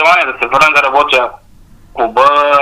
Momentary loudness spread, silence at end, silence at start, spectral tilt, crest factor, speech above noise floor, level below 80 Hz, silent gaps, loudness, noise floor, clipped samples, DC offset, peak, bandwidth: 11 LU; 0 s; 0 s; -2.5 dB/octave; 10 dB; 30 dB; -44 dBFS; none; -10 LUFS; -40 dBFS; 0.2%; 0.4%; 0 dBFS; 16 kHz